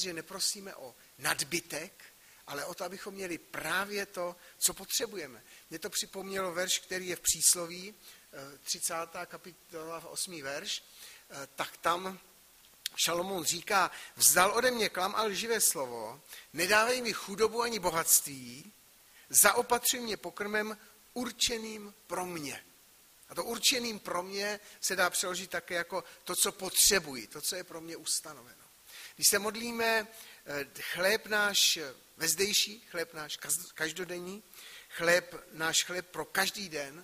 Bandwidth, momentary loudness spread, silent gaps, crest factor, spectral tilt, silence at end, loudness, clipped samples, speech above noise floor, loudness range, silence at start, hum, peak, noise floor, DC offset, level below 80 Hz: 15.5 kHz; 20 LU; none; 26 dB; -0.5 dB/octave; 0 s; -30 LUFS; under 0.1%; 28 dB; 8 LU; 0 s; none; -8 dBFS; -61 dBFS; under 0.1%; -66 dBFS